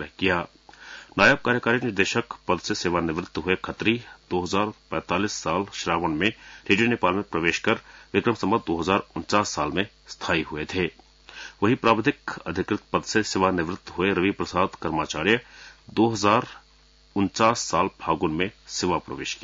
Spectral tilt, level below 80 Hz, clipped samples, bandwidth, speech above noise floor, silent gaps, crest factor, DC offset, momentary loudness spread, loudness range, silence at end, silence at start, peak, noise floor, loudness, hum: -4.5 dB/octave; -54 dBFS; under 0.1%; 7.8 kHz; 32 dB; none; 20 dB; under 0.1%; 9 LU; 3 LU; 0 s; 0 s; -4 dBFS; -56 dBFS; -24 LUFS; none